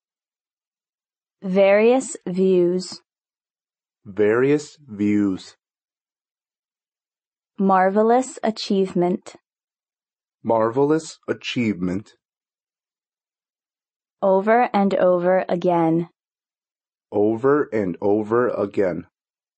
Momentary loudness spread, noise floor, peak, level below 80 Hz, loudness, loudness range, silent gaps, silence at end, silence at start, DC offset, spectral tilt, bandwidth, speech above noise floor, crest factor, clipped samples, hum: 12 LU; under -90 dBFS; -6 dBFS; -68 dBFS; -20 LUFS; 4 LU; 6.59-6.63 s, 7.27-7.32 s, 13.96-14.00 s; 0.55 s; 1.45 s; under 0.1%; -6.5 dB/octave; 8.4 kHz; over 71 dB; 16 dB; under 0.1%; none